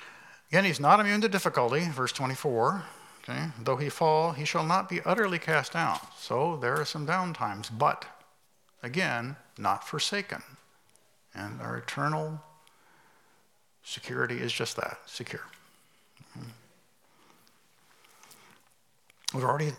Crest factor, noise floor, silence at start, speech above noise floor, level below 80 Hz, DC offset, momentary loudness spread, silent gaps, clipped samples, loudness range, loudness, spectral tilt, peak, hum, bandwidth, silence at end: 26 dB; -69 dBFS; 0 s; 39 dB; -80 dBFS; under 0.1%; 17 LU; none; under 0.1%; 11 LU; -29 LUFS; -4.5 dB/octave; -6 dBFS; none; 17 kHz; 0 s